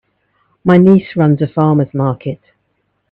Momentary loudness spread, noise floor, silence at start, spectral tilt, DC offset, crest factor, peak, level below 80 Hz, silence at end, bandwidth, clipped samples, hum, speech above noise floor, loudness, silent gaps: 15 LU; -65 dBFS; 0.65 s; -11 dB/octave; under 0.1%; 14 dB; 0 dBFS; -50 dBFS; 0.75 s; 4.5 kHz; under 0.1%; none; 54 dB; -12 LUFS; none